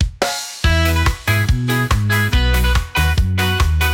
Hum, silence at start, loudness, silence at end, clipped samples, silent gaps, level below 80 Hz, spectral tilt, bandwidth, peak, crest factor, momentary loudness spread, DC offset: none; 0 s; -17 LUFS; 0 s; under 0.1%; none; -20 dBFS; -4.5 dB/octave; 17 kHz; -4 dBFS; 12 dB; 3 LU; under 0.1%